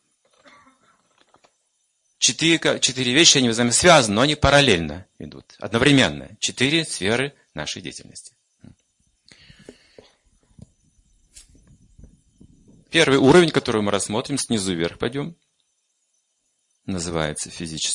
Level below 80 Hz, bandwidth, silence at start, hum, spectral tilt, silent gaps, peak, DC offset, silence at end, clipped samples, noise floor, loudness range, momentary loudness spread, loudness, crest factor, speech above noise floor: -48 dBFS; 11.5 kHz; 2.2 s; none; -3 dB/octave; none; 0 dBFS; under 0.1%; 0 s; under 0.1%; -71 dBFS; 13 LU; 21 LU; -18 LUFS; 22 dB; 51 dB